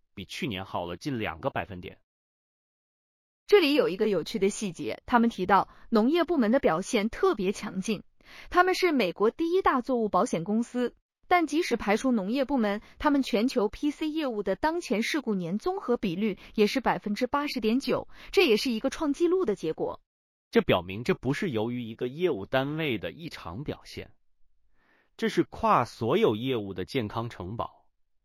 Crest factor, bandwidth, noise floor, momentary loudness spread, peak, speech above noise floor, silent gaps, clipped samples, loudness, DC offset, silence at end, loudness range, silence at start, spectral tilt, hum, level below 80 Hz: 20 dB; 15.5 kHz; -64 dBFS; 11 LU; -8 dBFS; 37 dB; 2.03-3.46 s, 11.02-11.09 s, 20.06-20.51 s; under 0.1%; -28 LUFS; under 0.1%; 0.6 s; 5 LU; 0.15 s; -5.5 dB/octave; none; -54 dBFS